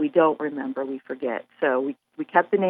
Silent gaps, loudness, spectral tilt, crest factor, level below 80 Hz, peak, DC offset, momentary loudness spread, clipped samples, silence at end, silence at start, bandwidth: none; -25 LUFS; -9.5 dB/octave; 20 dB; -82 dBFS; -4 dBFS; under 0.1%; 11 LU; under 0.1%; 0 s; 0 s; 3.9 kHz